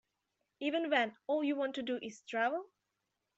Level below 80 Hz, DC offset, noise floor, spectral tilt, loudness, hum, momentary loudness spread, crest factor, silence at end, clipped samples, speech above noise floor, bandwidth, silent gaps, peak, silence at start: -86 dBFS; under 0.1%; -86 dBFS; -4 dB/octave; -36 LUFS; none; 8 LU; 20 dB; 0.75 s; under 0.1%; 51 dB; 8 kHz; none; -16 dBFS; 0.6 s